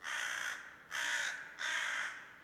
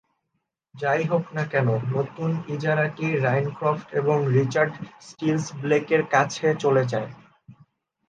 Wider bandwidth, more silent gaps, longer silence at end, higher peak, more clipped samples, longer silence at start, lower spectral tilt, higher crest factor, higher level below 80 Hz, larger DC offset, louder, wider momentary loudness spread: first, 19 kHz vs 9.2 kHz; neither; second, 0 s vs 0.55 s; second, -24 dBFS vs -4 dBFS; neither; second, 0 s vs 0.75 s; second, 1.5 dB/octave vs -6.5 dB/octave; about the same, 16 dB vs 20 dB; second, -82 dBFS vs -68 dBFS; neither; second, -38 LUFS vs -24 LUFS; about the same, 8 LU vs 7 LU